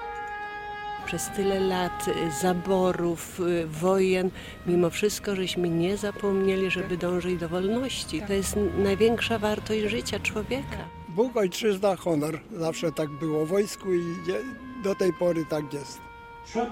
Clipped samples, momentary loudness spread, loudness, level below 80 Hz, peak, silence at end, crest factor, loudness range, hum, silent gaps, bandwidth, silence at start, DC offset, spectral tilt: under 0.1%; 10 LU; -27 LUFS; -48 dBFS; -10 dBFS; 0 s; 16 dB; 2 LU; none; none; 16.5 kHz; 0 s; under 0.1%; -5 dB/octave